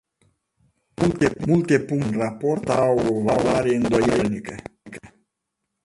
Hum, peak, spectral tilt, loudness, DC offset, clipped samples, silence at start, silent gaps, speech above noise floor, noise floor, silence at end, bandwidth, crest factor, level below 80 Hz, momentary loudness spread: none; -4 dBFS; -6.5 dB/octave; -21 LUFS; under 0.1%; under 0.1%; 1 s; none; 59 dB; -80 dBFS; 0.8 s; 11.5 kHz; 18 dB; -48 dBFS; 19 LU